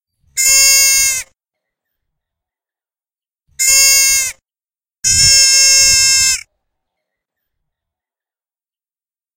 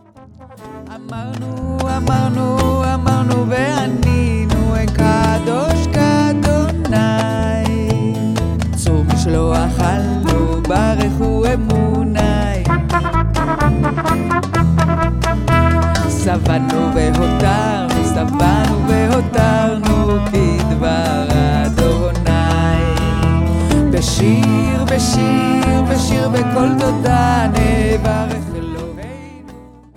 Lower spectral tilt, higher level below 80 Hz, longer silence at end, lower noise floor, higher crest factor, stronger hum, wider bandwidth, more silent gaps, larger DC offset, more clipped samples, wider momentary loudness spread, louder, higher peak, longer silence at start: second, 2.5 dB/octave vs -6.5 dB/octave; second, -42 dBFS vs -22 dBFS; first, 2.95 s vs 0.35 s; first, under -90 dBFS vs -40 dBFS; about the same, 16 dB vs 14 dB; neither; first, over 20 kHz vs 16 kHz; neither; neither; first, 0.2% vs under 0.1%; first, 12 LU vs 4 LU; first, -8 LUFS vs -15 LUFS; about the same, 0 dBFS vs 0 dBFS; first, 0.35 s vs 0.2 s